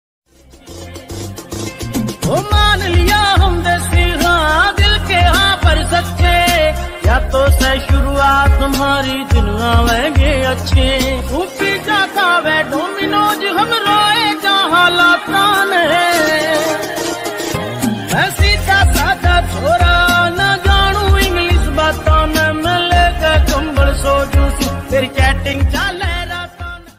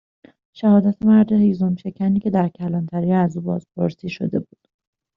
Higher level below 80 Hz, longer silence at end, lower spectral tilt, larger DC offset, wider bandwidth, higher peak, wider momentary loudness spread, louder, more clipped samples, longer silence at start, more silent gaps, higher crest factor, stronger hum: first, -18 dBFS vs -56 dBFS; second, 0.1 s vs 0.75 s; second, -4.5 dB/octave vs -9 dB/octave; neither; first, 16 kHz vs 5.8 kHz; first, 0 dBFS vs -4 dBFS; about the same, 9 LU vs 10 LU; first, -13 LUFS vs -19 LUFS; neither; about the same, 0.65 s vs 0.55 s; neither; about the same, 12 dB vs 16 dB; neither